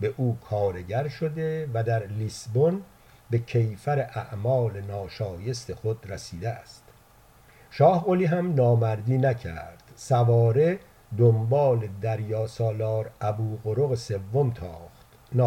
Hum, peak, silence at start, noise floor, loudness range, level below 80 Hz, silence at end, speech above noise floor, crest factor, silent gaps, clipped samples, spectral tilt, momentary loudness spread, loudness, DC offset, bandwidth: none; -6 dBFS; 0 s; -55 dBFS; 6 LU; -56 dBFS; 0 s; 30 dB; 18 dB; none; under 0.1%; -8 dB/octave; 13 LU; -26 LUFS; under 0.1%; 10.5 kHz